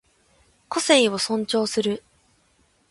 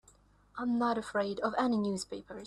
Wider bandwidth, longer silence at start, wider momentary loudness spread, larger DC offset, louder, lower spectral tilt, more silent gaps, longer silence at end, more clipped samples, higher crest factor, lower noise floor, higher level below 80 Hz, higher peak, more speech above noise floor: about the same, 11.5 kHz vs 12 kHz; first, 0.7 s vs 0.55 s; about the same, 11 LU vs 9 LU; neither; first, -22 LUFS vs -33 LUFS; second, -3 dB/octave vs -5 dB/octave; neither; first, 0.9 s vs 0 s; neither; about the same, 20 dB vs 16 dB; about the same, -63 dBFS vs -64 dBFS; about the same, -66 dBFS vs -66 dBFS; first, -4 dBFS vs -18 dBFS; first, 42 dB vs 31 dB